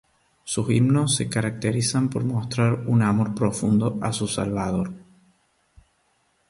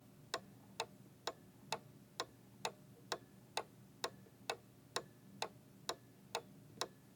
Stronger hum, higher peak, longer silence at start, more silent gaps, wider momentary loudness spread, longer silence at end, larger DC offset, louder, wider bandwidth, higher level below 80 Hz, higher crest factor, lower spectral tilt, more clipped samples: neither; first, -8 dBFS vs -22 dBFS; first, 0.45 s vs 0 s; neither; about the same, 8 LU vs 6 LU; first, 1.5 s vs 0 s; neither; first, -23 LUFS vs -48 LUFS; second, 11.5 kHz vs 19 kHz; first, -52 dBFS vs -82 dBFS; second, 16 dB vs 28 dB; first, -5.5 dB/octave vs -2 dB/octave; neither